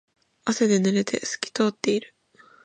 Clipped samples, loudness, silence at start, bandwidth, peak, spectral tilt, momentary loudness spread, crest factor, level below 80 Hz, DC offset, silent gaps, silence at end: under 0.1%; -24 LUFS; 0.45 s; 9.2 kHz; -6 dBFS; -4.5 dB/octave; 8 LU; 20 dB; -70 dBFS; under 0.1%; none; 0.6 s